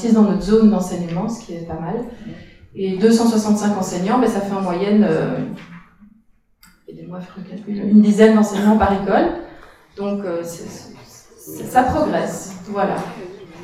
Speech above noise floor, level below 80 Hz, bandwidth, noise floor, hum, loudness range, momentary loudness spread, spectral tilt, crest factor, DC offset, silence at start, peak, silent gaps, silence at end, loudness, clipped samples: 38 dB; -44 dBFS; 14.5 kHz; -56 dBFS; none; 6 LU; 20 LU; -6.5 dB/octave; 18 dB; under 0.1%; 0 s; 0 dBFS; none; 0 s; -17 LUFS; under 0.1%